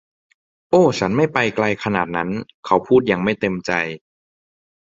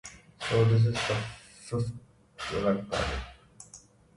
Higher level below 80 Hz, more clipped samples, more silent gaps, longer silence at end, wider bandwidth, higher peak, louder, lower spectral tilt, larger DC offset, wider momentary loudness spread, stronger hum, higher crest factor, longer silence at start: about the same, -52 dBFS vs -48 dBFS; neither; first, 2.54-2.63 s vs none; first, 0.95 s vs 0.4 s; second, 7.8 kHz vs 11.5 kHz; first, 0 dBFS vs -14 dBFS; first, -19 LUFS vs -29 LUFS; about the same, -6 dB/octave vs -6 dB/octave; neither; second, 9 LU vs 24 LU; neither; about the same, 20 dB vs 16 dB; first, 0.7 s vs 0.05 s